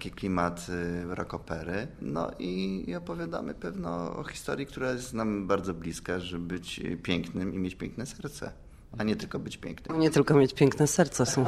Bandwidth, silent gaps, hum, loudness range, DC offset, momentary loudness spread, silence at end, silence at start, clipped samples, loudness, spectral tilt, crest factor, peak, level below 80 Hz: 15 kHz; none; none; 7 LU; under 0.1%; 13 LU; 0 s; 0 s; under 0.1%; -31 LUFS; -5.5 dB/octave; 22 dB; -8 dBFS; -52 dBFS